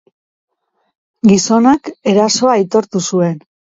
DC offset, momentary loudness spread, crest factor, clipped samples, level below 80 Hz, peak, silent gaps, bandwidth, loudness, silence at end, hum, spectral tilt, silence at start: under 0.1%; 7 LU; 14 dB; under 0.1%; -54 dBFS; 0 dBFS; none; 8 kHz; -13 LUFS; 0.4 s; none; -5 dB/octave; 1.25 s